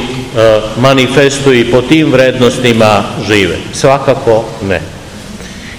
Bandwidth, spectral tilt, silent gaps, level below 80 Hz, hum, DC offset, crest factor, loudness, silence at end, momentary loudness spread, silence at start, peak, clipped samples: 19 kHz; -5 dB/octave; none; -34 dBFS; none; 0.8%; 10 dB; -9 LUFS; 0 s; 16 LU; 0 s; 0 dBFS; 4%